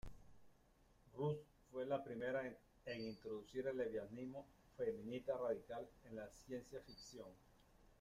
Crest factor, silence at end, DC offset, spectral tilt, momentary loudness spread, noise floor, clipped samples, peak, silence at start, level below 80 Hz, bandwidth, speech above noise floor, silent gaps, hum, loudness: 18 dB; 0.05 s; under 0.1%; -6.5 dB/octave; 13 LU; -73 dBFS; under 0.1%; -30 dBFS; 0.05 s; -70 dBFS; 15.5 kHz; 25 dB; none; none; -48 LUFS